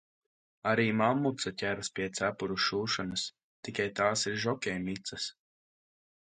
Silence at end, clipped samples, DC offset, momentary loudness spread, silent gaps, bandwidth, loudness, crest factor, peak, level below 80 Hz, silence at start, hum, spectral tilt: 0.9 s; under 0.1%; under 0.1%; 10 LU; 3.43-3.63 s; 9.6 kHz; -32 LUFS; 20 dB; -12 dBFS; -66 dBFS; 0.65 s; none; -4 dB/octave